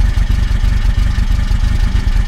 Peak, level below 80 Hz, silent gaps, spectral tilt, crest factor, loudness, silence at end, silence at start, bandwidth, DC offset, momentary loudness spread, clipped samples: -2 dBFS; -12 dBFS; none; -6 dB/octave; 10 dB; -16 LUFS; 0 s; 0 s; 9.8 kHz; under 0.1%; 1 LU; under 0.1%